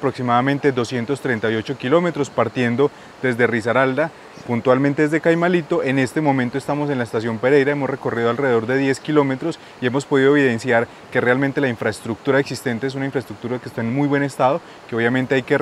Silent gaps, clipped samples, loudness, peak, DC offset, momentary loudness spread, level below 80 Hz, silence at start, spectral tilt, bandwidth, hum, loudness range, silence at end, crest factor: none; under 0.1%; -19 LUFS; -2 dBFS; under 0.1%; 8 LU; -62 dBFS; 0 s; -6.5 dB/octave; 13 kHz; none; 3 LU; 0 s; 18 dB